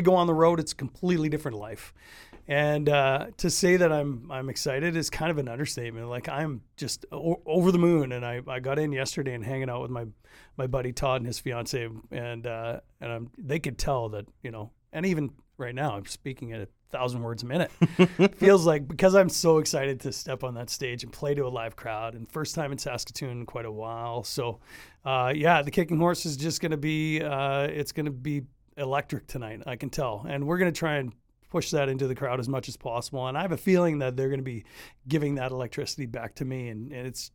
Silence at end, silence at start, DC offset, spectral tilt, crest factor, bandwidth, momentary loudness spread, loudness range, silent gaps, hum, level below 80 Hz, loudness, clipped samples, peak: 0.05 s; 0 s; under 0.1%; -5.5 dB/octave; 24 dB; 19 kHz; 15 LU; 9 LU; none; none; -52 dBFS; -28 LUFS; under 0.1%; -4 dBFS